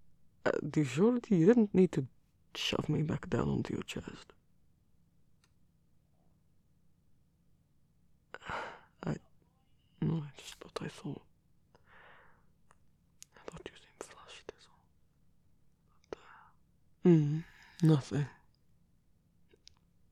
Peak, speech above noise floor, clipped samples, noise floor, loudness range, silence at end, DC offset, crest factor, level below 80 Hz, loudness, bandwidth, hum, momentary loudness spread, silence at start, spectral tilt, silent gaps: -14 dBFS; 39 dB; under 0.1%; -69 dBFS; 23 LU; 1.8 s; under 0.1%; 22 dB; -64 dBFS; -32 LUFS; 12.5 kHz; none; 24 LU; 0.45 s; -7 dB/octave; none